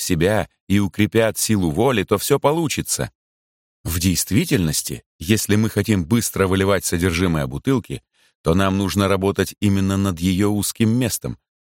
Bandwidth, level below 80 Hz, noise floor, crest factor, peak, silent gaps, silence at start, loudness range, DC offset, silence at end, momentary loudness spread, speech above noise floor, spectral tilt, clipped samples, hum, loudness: 17 kHz; -42 dBFS; under -90 dBFS; 16 dB; -2 dBFS; 0.60-0.67 s, 3.15-3.84 s, 5.06-5.19 s, 8.35-8.44 s; 0 s; 2 LU; under 0.1%; 0.25 s; 6 LU; over 71 dB; -5 dB/octave; under 0.1%; none; -19 LUFS